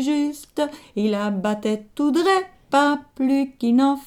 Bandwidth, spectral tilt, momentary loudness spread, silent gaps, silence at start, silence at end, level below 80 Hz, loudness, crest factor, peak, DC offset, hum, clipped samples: 16 kHz; -5.5 dB/octave; 8 LU; none; 0 s; 0 s; -60 dBFS; -22 LUFS; 16 dB; -6 dBFS; under 0.1%; none; under 0.1%